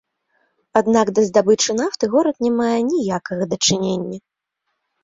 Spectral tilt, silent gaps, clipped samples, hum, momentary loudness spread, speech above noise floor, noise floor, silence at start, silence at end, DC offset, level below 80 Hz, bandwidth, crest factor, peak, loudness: -4 dB/octave; none; under 0.1%; none; 8 LU; 58 dB; -76 dBFS; 0.75 s; 0.85 s; under 0.1%; -58 dBFS; 8 kHz; 18 dB; 0 dBFS; -18 LUFS